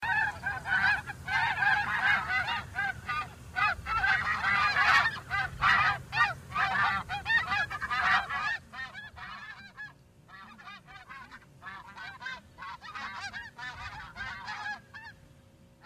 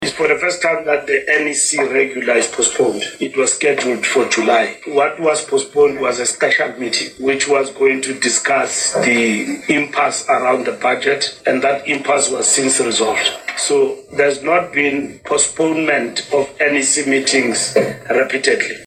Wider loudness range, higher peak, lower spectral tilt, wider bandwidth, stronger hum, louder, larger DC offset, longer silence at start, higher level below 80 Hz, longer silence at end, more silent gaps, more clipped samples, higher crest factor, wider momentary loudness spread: first, 18 LU vs 1 LU; second, -12 dBFS vs -2 dBFS; about the same, -3 dB/octave vs -2 dB/octave; first, 15.5 kHz vs 13.5 kHz; neither; second, -29 LUFS vs -15 LUFS; neither; about the same, 0 s vs 0 s; about the same, -56 dBFS vs -58 dBFS; first, 0.7 s vs 0 s; neither; neither; first, 20 dB vs 14 dB; first, 21 LU vs 4 LU